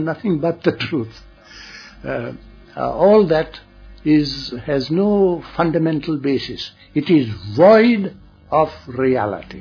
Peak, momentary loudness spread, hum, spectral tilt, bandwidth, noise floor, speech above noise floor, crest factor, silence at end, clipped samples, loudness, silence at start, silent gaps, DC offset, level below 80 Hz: -2 dBFS; 17 LU; none; -7.5 dB/octave; 5.4 kHz; -39 dBFS; 22 dB; 16 dB; 0 s; under 0.1%; -18 LUFS; 0 s; none; under 0.1%; -46 dBFS